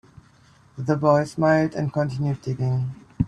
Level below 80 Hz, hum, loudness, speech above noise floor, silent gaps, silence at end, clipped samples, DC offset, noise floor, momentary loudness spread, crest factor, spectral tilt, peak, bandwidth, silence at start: -50 dBFS; none; -23 LUFS; 33 dB; none; 0 s; under 0.1%; under 0.1%; -54 dBFS; 8 LU; 18 dB; -8 dB/octave; -4 dBFS; 10.5 kHz; 0.75 s